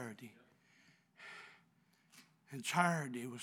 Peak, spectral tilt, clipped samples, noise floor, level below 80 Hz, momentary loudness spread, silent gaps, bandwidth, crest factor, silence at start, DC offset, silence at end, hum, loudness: -16 dBFS; -4.5 dB/octave; under 0.1%; -73 dBFS; under -90 dBFS; 23 LU; none; 18 kHz; 28 dB; 0 s; under 0.1%; 0 s; none; -37 LUFS